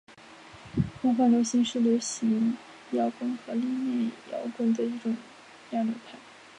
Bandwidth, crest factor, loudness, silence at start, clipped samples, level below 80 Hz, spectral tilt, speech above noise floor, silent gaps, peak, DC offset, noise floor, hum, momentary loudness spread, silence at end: 10.5 kHz; 16 dB; -28 LUFS; 0.1 s; under 0.1%; -58 dBFS; -5.5 dB/octave; 22 dB; none; -12 dBFS; under 0.1%; -50 dBFS; none; 17 LU; 0 s